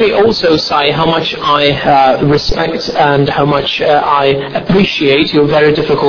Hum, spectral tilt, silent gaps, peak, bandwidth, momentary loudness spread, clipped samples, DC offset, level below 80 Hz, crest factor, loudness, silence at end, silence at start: none; -6 dB/octave; none; 0 dBFS; 5.4 kHz; 4 LU; under 0.1%; under 0.1%; -32 dBFS; 10 dB; -10 LUFS; 0 s; 0 s